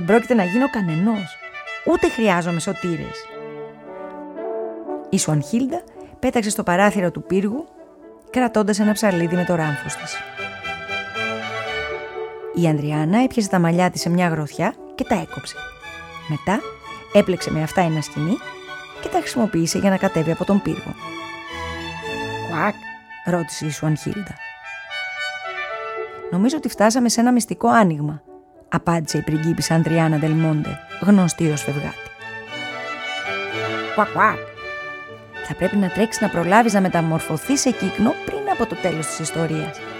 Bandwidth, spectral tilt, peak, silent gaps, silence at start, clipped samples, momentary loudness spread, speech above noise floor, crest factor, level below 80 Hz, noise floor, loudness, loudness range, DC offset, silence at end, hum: 16.5 kHz; -5.5 dB/octave; 0 dBFS; none; 0 s; under 0.1%; 15 LU; 24 dB; 20 dB; -50 dBFS; -43 dBFS; -21 LUFS; 6 LU; under 0.1%; 0 s; none